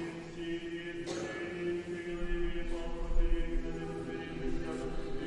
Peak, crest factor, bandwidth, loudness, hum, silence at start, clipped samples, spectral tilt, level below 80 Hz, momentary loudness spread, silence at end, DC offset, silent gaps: -16 dBFS; 18 dB; 10.5 kHz; -39 LUFS; none; 0 s; under 0.1%; -6 dB/octave; -38 dBFS; 4 LU; 0 s; under 0.1%; none